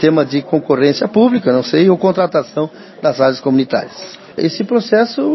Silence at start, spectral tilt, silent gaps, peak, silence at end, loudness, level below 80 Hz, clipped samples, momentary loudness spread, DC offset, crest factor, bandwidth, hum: 0 s; -7 dB/octave; none; 0 dBFS; 0 s; -14 LUFS; -58 dBFS; under 0.1%; 9 LU; under 0.1%; 14 dB; 6.2 kHz; none